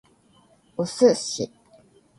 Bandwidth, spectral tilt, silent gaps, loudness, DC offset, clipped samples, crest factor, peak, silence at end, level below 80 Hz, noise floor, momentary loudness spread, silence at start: 11.5 kHz; -4.5 dB/octave; none; -23 LUFS; under 0.1%; under 0.1%; 20 dB; -6 dBFS; 0.7 s; -66 dBFS; -59 dBFS; 15 LU; 0.8 s